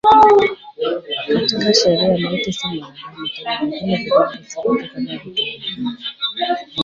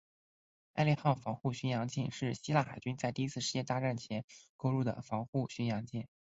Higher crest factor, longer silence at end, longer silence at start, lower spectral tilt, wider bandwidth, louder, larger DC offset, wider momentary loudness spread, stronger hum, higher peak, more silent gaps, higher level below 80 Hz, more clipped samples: second, 16 dB vs 22 dB; second, 0 s vs 0.35 s; second, 0.05 s vs 0.75 s; second, -4.5 dB/octave vs -6 dB/octave; about the same, 7.6 kHz vs 8 kHz; first, -18 LUFS vs -36 LUFS; neither; first, 12 LU vs 9 LU; neither; first, -2 dBFS vs -14 dBFS; second, none vs 4.24-4.28 s, 4.49-4.59 s, 5.28-5.33 s; first, -52 dBFS vs -68 dBFS; neither